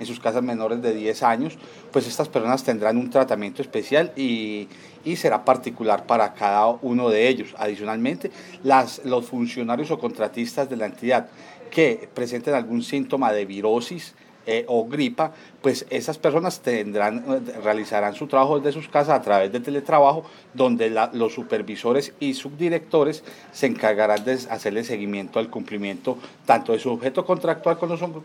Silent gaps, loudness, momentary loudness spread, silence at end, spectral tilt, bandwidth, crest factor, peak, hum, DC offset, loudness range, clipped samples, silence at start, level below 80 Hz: none; -23 LUFS; 9 LU; 0 s; -5.5 dB/octave; 18 kHz; 20 dB; -2 dBFS; none; under 0.1%; 4 LU; under 0.1%; 0 s; -78 dBFS